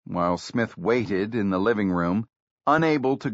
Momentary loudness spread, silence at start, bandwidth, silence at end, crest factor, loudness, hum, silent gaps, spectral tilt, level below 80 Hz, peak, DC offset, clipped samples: 7 LU; 0.1 s; 8 kHz; 0 s; 16 dB; -24 LUFS; none; 2.36-2.57 s; -5.5 dB/octave; -58 dBFS; -8 dBFS; under 0.1%; under 0.1%